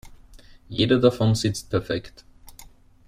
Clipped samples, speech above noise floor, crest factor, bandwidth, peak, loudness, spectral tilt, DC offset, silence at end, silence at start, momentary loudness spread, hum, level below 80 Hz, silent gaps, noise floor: under 0.1%; 27 dB; 20 dB; 15 kHz; -4 dBFS; -23 LUFS; -6 dB/octave; under 0.1%; 0.45 s; 0.05 s; 12 LU; none; -48 dBFS; none; -48 dBFS